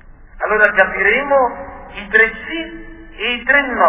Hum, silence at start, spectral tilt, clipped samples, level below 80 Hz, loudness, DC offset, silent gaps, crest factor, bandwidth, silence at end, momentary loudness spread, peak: none; 0.05 s; -6.5 dB/octave; under 0.1%; -40 dBFS; -15 LUFS; under 0.1%; none; 16 dB; 4 kHz; 0 s; 18 LU; 0 dBFS